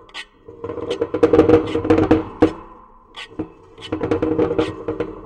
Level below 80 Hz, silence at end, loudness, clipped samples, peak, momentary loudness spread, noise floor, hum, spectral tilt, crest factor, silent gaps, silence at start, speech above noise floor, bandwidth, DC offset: -42 dBFS; 0 s; -18 LUFS; under 0.1%; -2 dBFS; 21 LU; -44 dBFS; none; -7.5 dB/octave; 18 dB; none; 0.15 s; 28 dB; 9.2 kHz; under 0.1%